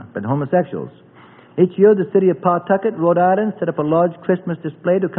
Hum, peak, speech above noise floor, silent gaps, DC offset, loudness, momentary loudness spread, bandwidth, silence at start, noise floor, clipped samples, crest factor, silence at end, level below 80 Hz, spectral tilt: none; 0 dBFS; 28 dB; none; under 0.1%; -17 LUFS; 11 LU; 3.8 kHz; 0 s; -45 dBFS; under 0.1%; 16 dB; 0 s; -62 dBFS; -13 dB/octave